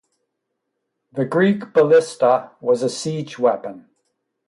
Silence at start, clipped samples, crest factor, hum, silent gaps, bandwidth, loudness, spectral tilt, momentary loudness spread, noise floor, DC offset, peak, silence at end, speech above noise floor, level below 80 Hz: 1.15 s; under 0.1%; 16 dB; none; none; 11.5 kHz; -19 LUFS; -6 dB/octave; 12 LU; -77 dBFS; under 0.1%; -4 dBFS; 0.7 s; 59 dB; -68 dBFS